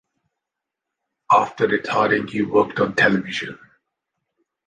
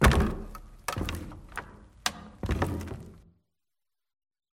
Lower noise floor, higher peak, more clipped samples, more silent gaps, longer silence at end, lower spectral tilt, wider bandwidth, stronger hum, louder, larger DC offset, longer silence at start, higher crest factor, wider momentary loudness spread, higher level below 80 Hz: second, -84 dBFS vs under -90 dBFS; about the same, -4 dBFS vs -6 dBFS; neither; neither; second, 1.1 s vs 1.4 s; about the same, -5.5 dB/octave vs -5 dB/octave; second, 9.4 kHz vs 16.5 kHz; neither; first, -19 LUFS vs -33 LUFS; neither; first, 1.3 s vs 0 s; second, 20 dB vs 26 dB; second, 9 LU vs 15 LU; second, -60 dBFS vs -36 dBFS